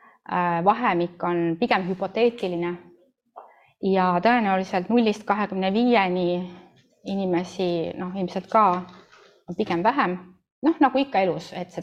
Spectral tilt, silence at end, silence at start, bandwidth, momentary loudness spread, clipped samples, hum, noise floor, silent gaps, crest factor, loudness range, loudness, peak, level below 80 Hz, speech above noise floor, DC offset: -7 dB/octave; 0 s; 0.3 s; 9.2 kHz; 10 LU; under 0.1%; none; -53 dBFS; 10.52-10.62 s; 18 dB; 3 LU; -23 LUFS; -6 dBFS; -66 dBFS; 30 dB; under 0.1%